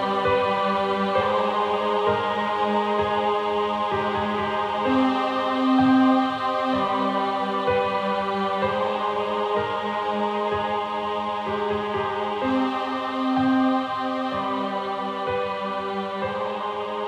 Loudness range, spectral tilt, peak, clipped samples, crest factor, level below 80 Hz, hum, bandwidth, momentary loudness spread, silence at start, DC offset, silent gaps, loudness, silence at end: 4 LU; -6 dB/octave; -8 dBFS; under 0.1%; 14 dB; -58 dBFS; none; 9.4 kHz; 6 LU; 0 s; under 0.1%; none; -24 LUFS; 0 s